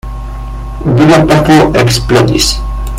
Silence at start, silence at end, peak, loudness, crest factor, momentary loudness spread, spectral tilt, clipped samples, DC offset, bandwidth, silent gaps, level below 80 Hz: 0.05 s; 0 s; 0 dBFS; -8 LUFS; 8 dB; 17 LU; -5 dB/octave; 0.6%; under 0.1%; 16.5 kHz; none; -20 dBFS